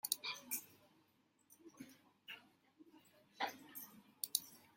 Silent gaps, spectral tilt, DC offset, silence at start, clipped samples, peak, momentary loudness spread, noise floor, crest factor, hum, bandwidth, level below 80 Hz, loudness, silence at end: none; 0.5 dB/octave; under 0.1%; 0.05 s; under 0.1%; -14 dBFS; 23 LU; -77 dBFS; 36 dB; none; 16.5 kHz; under -90 dBFS; -45 LUFS; 0.1 s